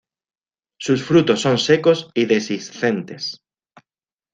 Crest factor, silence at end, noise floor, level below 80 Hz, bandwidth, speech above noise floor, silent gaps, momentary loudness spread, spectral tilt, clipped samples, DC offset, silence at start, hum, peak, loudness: 18 dB; 1 s; under -90 dBFS; -60 dBFS; 9.4 kHz; over 72 dB; none; 13 LU; -5 dB/octave; under 0.1%; under 0.1%; 0.8 s; none; -2 dBFS; -18 LUFS